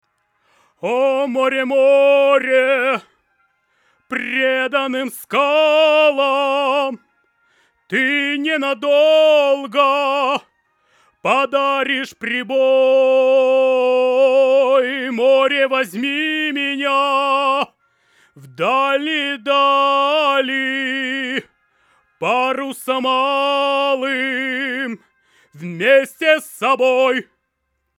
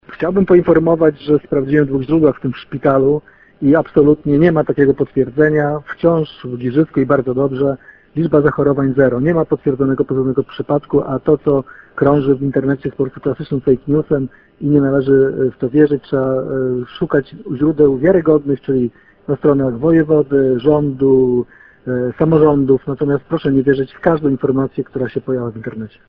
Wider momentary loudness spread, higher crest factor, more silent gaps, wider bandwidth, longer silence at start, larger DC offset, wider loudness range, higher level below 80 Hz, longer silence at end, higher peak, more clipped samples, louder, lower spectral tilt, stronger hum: about the same, 9 LU vs 9 LU; about the same, 16 dB vs 14 dB; neither; first, 15 kHz vs 5.2 kHz; first, 0.85 s vs 0.1 s; neither; about the same, 4 LU vs 2 LU; second, -78 dBFS vs -44 dBFS; first, 0.75 s vs 0.2 s; about the same, -2 dBFS vs 0 dBFS; neither; about the same, -16 LUFS vs -15 LUFS; second, -3.5 dB/octave vs -11 dB/octave; neither